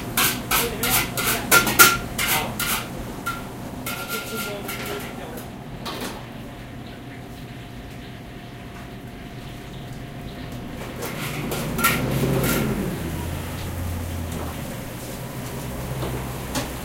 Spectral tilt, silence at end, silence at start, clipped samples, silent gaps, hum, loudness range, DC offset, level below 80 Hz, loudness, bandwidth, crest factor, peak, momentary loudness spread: -3 dB/octave; 0 s; 0 s; under 0.1%; none; none; 17 LU; under 0.1%; -40 dBFS; -23 LUFS; 17 kHz; 26 dB; 0 dBFS; 17 LU